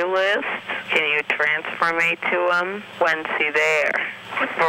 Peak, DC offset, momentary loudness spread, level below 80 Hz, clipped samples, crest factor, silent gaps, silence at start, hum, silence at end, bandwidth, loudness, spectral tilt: -6 dBFS; under 0.1%; 7 LU; -68 dBFS; under 0.1%; 16 dB; none; 0 s; none; 0 s; 16.5 kHz; -20 LUFS; -3 dB/octave